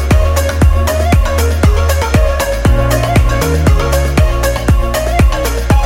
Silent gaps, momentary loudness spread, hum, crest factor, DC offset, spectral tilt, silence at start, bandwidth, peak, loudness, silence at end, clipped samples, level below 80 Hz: none; 2 LU; none; 10 dB; under 0.1%; -5.5 dB/octave; 0 s; 16.5 kHz; 0 dBFS; -12 LUFS; 0 s; under 0.1%; -12 dBFS